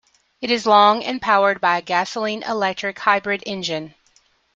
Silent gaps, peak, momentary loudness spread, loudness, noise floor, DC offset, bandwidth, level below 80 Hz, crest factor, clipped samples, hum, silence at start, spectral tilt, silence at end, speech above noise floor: none; 0 dBFS; 12 LU; -19 LUFS; -59 dBFS; under 0.1%; 7.8 kHz; -62 dBFS; 20 dB; under 0.1%; none; 0.4 s; -3.5 dB/octave; 0.7 s; 41 dB